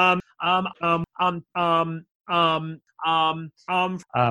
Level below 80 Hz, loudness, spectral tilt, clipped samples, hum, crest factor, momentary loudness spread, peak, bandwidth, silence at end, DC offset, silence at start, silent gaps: -62 dBFS; -24 LUFS; -6 dB/octave; under 0.1%; none; 18 dB; 8 LU; -6 dBFS; 11 kHz; 0 s; under 0.1%; 0 s; 2.11-2.20 s